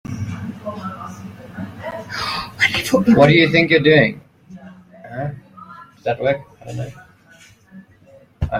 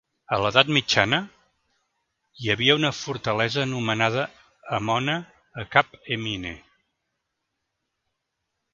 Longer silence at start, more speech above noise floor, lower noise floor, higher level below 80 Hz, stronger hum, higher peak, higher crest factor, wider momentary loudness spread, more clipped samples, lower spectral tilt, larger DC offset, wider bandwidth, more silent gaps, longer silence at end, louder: second, 0.1 s vs 0.3 s; second, 33 dB vs 56 dB; second, -48 dBFS vs -80 dBFS; first, -44 dBFS vs -56 dBFS; neither; about the same, 0 dBFS vs 0 dBFS; second, 18 dB vs 26 dB; first, 22 LU vs 14 LU; neither; first, -6 dB/octave vs -4 dB/octave; neither; first, 16 kHz vs 7.8 kHz; neither; second, 0 s vs 2.15 s; first, -17 LUFS vs -23 LUFS